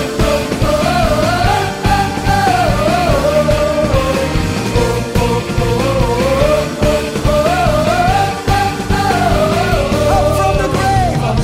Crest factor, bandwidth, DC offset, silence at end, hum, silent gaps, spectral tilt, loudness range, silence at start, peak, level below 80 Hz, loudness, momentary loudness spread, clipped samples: 12 dB; 16 kHz; under 0.1%; 0 s; none; none; -5.5 dB/octave; 1 LU; 0 s; -2 dBFS; -22 dBFS; -14 LUFS; 3 LU; under 0.1%